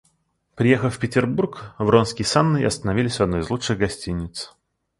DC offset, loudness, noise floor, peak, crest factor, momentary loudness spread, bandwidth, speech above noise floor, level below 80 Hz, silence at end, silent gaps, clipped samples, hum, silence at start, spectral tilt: under 0.1%; -21 LUFS; -68 dBFS; -2 dBFS; 20 dB; 10 LU; 11.5 kHz; 47 dB; -44 dBFS; 0.5 s; none; under 0.1%; none; 0.55 s; -5.5 dB/octave